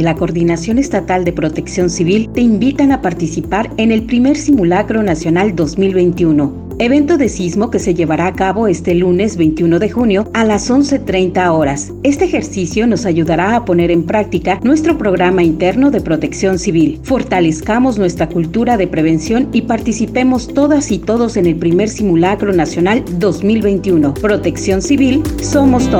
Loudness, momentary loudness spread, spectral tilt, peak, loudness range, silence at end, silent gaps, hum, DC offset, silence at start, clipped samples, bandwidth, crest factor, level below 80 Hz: -13 LUFS; 4 LU; -6 dB/octave; 0 dBFS; 1 LU; 0 s; none; none; under 0.1%; 0 s; under 0.1%; 15.5 kHz; 12 dB; -32 dBFS